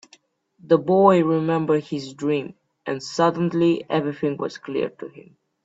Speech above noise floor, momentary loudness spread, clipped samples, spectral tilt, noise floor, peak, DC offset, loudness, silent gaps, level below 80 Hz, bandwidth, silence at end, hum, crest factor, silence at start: 36 dB; 15 LU; under 0.1%; -7 dB/octave; -57 dBFS; -2 dBFS; under 0.1%; -22 LUFS; none; -64 dBFS; 8 kHz; 0.45 s; none; 20 dB; 0.65 s